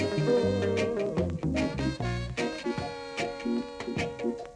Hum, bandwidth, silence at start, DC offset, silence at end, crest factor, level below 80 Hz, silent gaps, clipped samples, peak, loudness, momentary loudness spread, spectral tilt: none; 11 kHz; 0 s; under 0.1%; 0 s; 16 dB; -46 dBFS; none; under 0.1%; -14 dBFS; -30 LUFS; 8 LU; -6.5 dB/octave